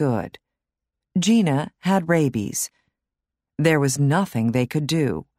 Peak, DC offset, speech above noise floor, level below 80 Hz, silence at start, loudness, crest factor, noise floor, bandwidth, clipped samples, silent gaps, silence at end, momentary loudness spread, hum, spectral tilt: -4 dBFS; under 0.1%; 65 dB; -58 dBFS; 0 s; -21 LUFS; 18 dB; -85 dBFS; 16 kHz; under 0.1%; none; 0.15 s; 9 LU; none; -5.5 dB/octave